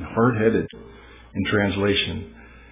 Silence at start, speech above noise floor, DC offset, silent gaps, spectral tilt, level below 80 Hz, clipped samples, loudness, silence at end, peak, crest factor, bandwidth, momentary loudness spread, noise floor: 0 s; 24 dB; under 0.1%; none; -10 dB/octave; -44 dBFS; under 0.1%; -22 LUFS; 0.15 s; -6 dBFS; 18 dB; 3.9 kHz; 16 LU; -45 dBFS